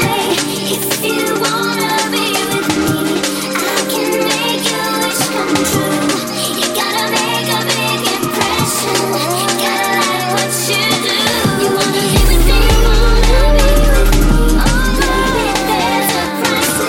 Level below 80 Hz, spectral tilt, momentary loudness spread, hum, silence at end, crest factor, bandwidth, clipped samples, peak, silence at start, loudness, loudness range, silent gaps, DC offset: -18 dBFS; -3.5 dB/octave; 3 LU; none; 0 s; 12 dB; 17 kHz; under 0.1%; 0 dBFS; 0 s; -14 LUFS; 2 LU; none; under 0.1%